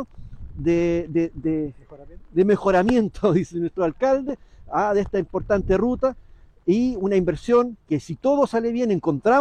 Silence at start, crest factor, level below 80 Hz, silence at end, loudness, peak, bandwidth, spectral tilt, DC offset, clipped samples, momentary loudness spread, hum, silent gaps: 0 s; 14 dB; -42 dBFS; 0 s; -22 LUFS; -8 dBFS; 9.4 kHz; -7.5 dB/octave; under 0.1%; under 0.1%; 8 LU; none; none